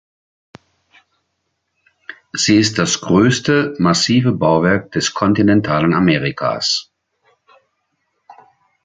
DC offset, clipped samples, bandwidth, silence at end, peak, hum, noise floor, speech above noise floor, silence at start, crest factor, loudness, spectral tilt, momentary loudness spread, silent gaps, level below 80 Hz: under 0.1%; under 0.1%; 9.4 kHz; 0.5 s; 0 dBFS; none; -71 dBFS; 57 dB; 2.1 s; 16 dB; -15 LUFS; -4.5 dB/octave; 7 LU; none; -48 dBFS